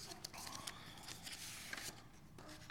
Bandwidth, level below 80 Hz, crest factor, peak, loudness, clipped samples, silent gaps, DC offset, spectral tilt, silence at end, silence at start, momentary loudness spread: 19 kHz; -68 dBFS; 26 dB; -26 dBFS; -50 LUFS; under 0.1%; none; under 0.1%; -1.5 dB/octave; 0 s; 0 s; 11 LU